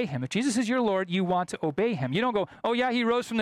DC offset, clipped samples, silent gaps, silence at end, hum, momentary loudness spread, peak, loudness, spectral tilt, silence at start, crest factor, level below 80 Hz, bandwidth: under 0.1%; under 0.1%; none; 0 s; none; 3 LU; -16 dBFS; -27 LUFS; -5.5 dB/octave; 0 s; 10 dB; -64 dBFS; 13.5 kHz